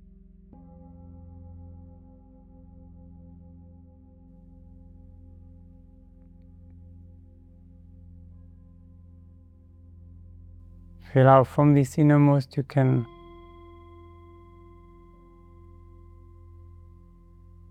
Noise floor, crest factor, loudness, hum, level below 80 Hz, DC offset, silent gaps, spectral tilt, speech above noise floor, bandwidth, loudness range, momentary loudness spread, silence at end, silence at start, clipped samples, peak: -51 dBFS; 24 dB; -21 LUFS; none; -54 dBFS; under 0.1%; none; -9 dB/octave; 32 dB; 9.4 kHz; 15 LU; 31 LU; 4.65 s; 11.15 s; under 0.1%; -4 dBFS